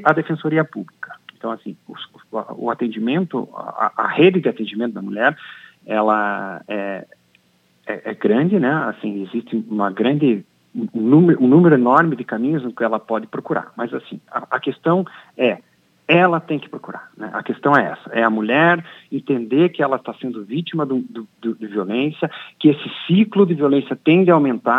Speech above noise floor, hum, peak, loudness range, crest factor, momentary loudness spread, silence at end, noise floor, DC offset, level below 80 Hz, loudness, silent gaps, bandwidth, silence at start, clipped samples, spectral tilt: 41 dB; none; 0 dBFS; 7 LU; 18 dB; 16 LU; 0 s; -59 dBFS; under 0.1%; -76 dBFS; -18 LUFS; none; 5.4 kHz; 0 s; under 0.1%; -9 dB/octave